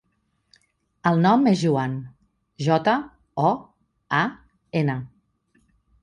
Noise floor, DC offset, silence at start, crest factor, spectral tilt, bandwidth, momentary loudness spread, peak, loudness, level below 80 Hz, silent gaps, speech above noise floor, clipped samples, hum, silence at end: -71 dBFS; under 0.1%; 1.05 s; 18 dB; -7 dB/octave; 10 kHz; 15 LU; -6 dBFS; -23 LUFS; -62 dBFS; none; 50 dB; under 0.1%; none; 0.95 s